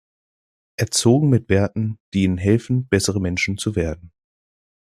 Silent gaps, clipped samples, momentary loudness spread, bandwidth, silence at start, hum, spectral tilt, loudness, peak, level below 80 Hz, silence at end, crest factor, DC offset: 2.00-2.12 s; under 0.1%; 10 LU; 14.5 kHz; 0.8 s; none; -5.5 dB/octave; -20 LUFS; -2 dBFS; -48 dBFS; 0.9 s; 18 dB; under 0.1%